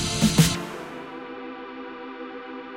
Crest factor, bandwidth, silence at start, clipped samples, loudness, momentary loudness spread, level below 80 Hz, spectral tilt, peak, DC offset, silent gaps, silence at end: 22 dB; 16 kHz; 0 s; under 0.1%; -23 LUFS; 18 LU; -44 dBFS; -4.5 dB/octave; -6 dBFS; under 0.1%; none; 0 s